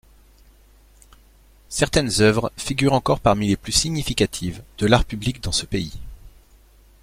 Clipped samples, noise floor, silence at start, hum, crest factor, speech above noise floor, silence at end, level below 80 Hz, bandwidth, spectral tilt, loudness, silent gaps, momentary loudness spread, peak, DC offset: under 0.1%; -52 dBFS; 1.7 s; none; 20 dB; 31 dB; 0.75 s; -36 dBFS; 16.5 kHz; -4.5 dB/octave; -21 LUFS; none; 11 LU; -2 dBFS; under 0.1%